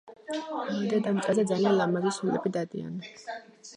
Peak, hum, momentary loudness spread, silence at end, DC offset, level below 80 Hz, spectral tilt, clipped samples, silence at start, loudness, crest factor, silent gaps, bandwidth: -12 dBFS; none; 15 LU; 0 s; under 0.1%; -76 dBFS; -6 dB/octave; under 0.1%; 0.05 s; -28 LUFS; 16 dB; none; 11 kHz